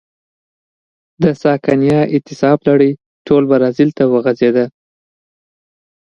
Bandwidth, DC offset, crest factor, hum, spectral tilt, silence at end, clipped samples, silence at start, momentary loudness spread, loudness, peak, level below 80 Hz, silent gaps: 7.2 kHz; under 0.1%; 14 dB; none; -8.5 dB/octave; 1.4 s; under 0.1%; 1.2 s; 5 LU; -13 LUFS; 0 dBFS; -54 dBFS; 3.06-3.25 s